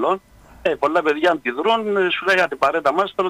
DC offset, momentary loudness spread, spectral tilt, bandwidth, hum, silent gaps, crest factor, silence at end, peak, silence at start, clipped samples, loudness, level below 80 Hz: under 0.1%; 6 LU; -4.5 dB/octave; 15.5 kHz; none; none; 14 dB; 0 s; -4 dBFS; 0 s; under 0.1%; -19 LUFS; -56 dBFS